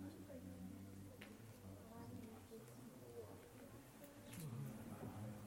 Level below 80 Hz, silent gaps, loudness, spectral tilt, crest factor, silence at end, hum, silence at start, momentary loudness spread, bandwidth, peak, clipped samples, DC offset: -76 dBFS; none; -56 LUFS; -6 dB/octave; 18 dB; 0 s; none; 0 s; 7 LU; 16.5 kHz; -38 dBFS; under 0.1%; under 0.1%